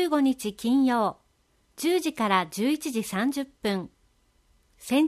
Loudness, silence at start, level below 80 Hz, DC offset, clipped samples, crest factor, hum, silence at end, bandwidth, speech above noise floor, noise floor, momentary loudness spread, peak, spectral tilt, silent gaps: -26 LUFS; 0 s; -64 dBFS; under 0.1%; under 0.1%; 20 dB; none; 0 s; 15 kHz; 41 dB; -67 dBFS; 7 LU; -8 dBFS; -4.5 dB/octave; none